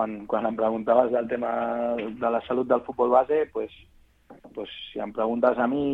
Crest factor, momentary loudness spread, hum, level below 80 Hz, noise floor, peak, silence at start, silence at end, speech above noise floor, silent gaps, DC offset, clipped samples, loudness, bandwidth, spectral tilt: 20 dB; 14 LU; none; -60 dBFS; -51 dBFS; -6 dBFS; 0 s; 0 s; 26 dB; none; under 0.1%; under 0.1%; -25 LUFS; 4.3 kHz; -8 dB/octave